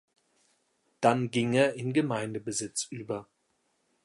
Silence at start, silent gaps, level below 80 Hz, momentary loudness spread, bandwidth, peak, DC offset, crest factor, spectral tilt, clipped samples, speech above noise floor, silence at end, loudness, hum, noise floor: 1 s; none; -72 dBFS; 11 LU; 11.5 kHz; -10 dBFS; under 0.1%; 22 dB; -5 dB/octave; under 0.1%; 46 dB; 0.8 s; -29 LUFS; none; -74 dBFS